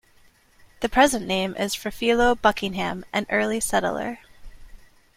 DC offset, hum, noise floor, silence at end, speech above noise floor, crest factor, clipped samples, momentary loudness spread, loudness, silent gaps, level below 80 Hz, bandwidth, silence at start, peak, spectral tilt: under 0.1%; none; -56 dBFS; 0.4 s; 34 dB; 20 dB; under 0.1%; 10 LU; -23 LUFS; none; -44 dBFS; 16.5 kHz; 0.8 s; -4 dBFS; -3.5 dB/octave